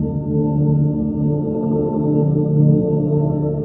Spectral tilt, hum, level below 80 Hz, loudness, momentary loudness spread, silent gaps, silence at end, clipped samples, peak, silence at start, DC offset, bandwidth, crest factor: -15.5 dB/octave; none; -40 dBFS; -18 LUFS; 5 LU; none; 0 s; under 0.1%; -2 dBFS; 0 s; under 0.1%; 1.4 kHz; 14 dB